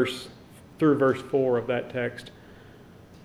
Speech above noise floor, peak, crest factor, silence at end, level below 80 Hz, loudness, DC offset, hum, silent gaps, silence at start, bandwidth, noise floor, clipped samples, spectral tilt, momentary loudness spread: 24 dB; -10 dBFS; 18 dB; 0.1 s; -60 dBFS; -26 LUFS; under 0.1%; none; none; 0 s; 13.5 kHz; -49 dBFS; under 0.1%; -6.5 dB/octave; 21 LU